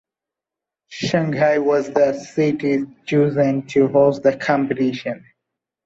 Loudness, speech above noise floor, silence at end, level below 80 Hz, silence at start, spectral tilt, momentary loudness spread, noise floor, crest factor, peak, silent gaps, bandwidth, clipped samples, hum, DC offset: -19 LUFS; 69 dB; 0.7 s; -60 dBFS; 0.9 s; -7 dB/octave; 9 LU; -87 dBFS; 16 dB; -4 dBFS; none; 7.8 kHz; under 0.1%; none; under 0.1%